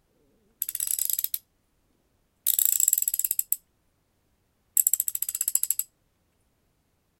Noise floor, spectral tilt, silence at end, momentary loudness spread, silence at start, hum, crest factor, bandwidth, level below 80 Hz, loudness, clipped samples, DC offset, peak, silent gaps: -71 dBFS; 3.5 dB/octave; 1.35 s; 10 LU; 0.6 s; none; 28 dB; 17.5 kHz; -72 dBFS; -24 LUFS; under 0.1%; under 0.1%; -2 dBFS; none